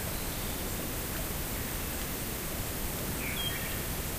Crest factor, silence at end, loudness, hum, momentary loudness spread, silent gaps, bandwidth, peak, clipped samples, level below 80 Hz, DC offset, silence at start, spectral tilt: 14 dB; 0 s; -34 LUFS; none; 2 LU; none; 16 kHz; -20 dBFS; under 0.1%; -42 dBFS; under 0.1%; 0 s; -3 dB/octave